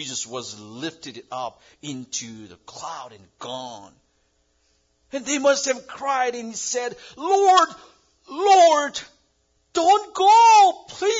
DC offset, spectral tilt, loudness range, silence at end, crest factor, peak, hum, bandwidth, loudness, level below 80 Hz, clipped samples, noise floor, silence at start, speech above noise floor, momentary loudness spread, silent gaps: under 0.1%; -1.5 dB/octave; 18 LU; 0 s; 18 dB; -4 dBFS; none; 7.8 kHz; -19 LUFS; -68 dBFS; under 0.1%; -67 dBFS; 0 s; 46 dB; 22 LU; none